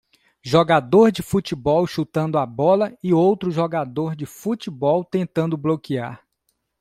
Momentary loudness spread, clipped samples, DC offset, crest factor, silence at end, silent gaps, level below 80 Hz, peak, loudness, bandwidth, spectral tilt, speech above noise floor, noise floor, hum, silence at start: 11 LU; under 0.1%; under 0.1%; 18 dB; 0.65 s; none; -54 dBFS; -2 dBFS; -20 LUFS; 15.5 kHz; -7 dB/octave; 52 dB; -72 dBFS; none; 0.45 s